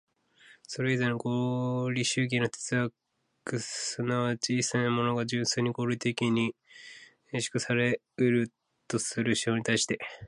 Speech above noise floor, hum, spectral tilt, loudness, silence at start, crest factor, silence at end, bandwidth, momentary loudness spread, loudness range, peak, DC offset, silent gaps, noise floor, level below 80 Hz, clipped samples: 30 dB; none; -4.5 dB/octave; -29 LUFS; 0.7 s; 18 dB; 0 s; 11.5 kHz; 8 LU; 1 LU; -12 dBFS; under 0.1%; none; -59 dBFS; -68 dBFS; under 0.1%